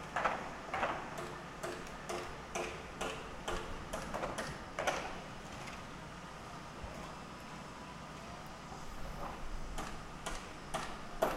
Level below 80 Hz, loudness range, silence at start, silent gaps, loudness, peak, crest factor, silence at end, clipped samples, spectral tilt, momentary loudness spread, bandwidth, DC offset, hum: -52 dBFS; 6 LU; 0 s; none; -43 LUFS; -18 dBFS; 24 dB; 0 s; under 0.1%; -4 dB/octave; 10 LU; 16 kHz; under 0.1%; none